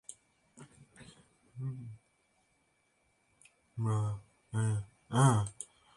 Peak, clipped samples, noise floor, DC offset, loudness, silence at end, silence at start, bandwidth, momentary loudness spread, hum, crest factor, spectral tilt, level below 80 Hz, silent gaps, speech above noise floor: -12 dBFS; under 0.1%; -75 dBFS; under 0.1%; -34 LUFS; 0.3 s; 0.1 s; 11.5 kHz; 24 LU; none; 24 dB; -6 dB/octave; -64 dBFS; none; 44 dB